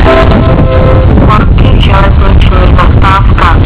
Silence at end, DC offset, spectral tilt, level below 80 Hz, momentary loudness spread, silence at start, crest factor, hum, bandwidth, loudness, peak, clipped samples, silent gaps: 0 s; under 0.1%; -11 dB/octave; -6 dBFS; 1 LU; 0 s; 4 dB; none; 4 kHz; -5 LUFS; 0 dBFS; 20%; none